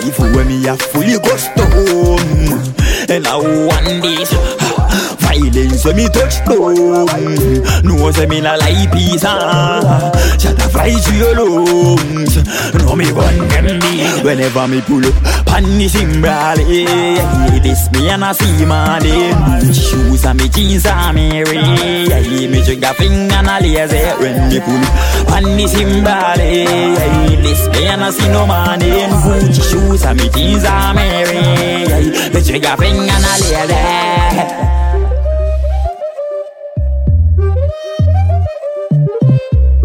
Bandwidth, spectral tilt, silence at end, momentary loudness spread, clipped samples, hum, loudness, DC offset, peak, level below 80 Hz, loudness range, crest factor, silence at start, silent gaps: 17 kHz; -5 dB/octave; 0 s; 3 LU; under 0.1%; none; -11 LUFS; under 0.1%; 0 dBFS; -16 dBFS; 2 LU; 10 dB; 0 s; none